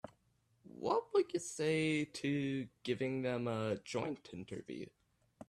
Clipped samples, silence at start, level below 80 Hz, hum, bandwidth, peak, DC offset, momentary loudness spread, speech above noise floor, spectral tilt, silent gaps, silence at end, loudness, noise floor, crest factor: under 0.1%; 0.05 s; -74 dBFS; none; 13 kHz; -22 dBFS; under 0.1%; 14 LU; 38 dB; -5.5 dB/octave; none; 0.05 s; -38 LUFS; -76 dBFS; 18 dB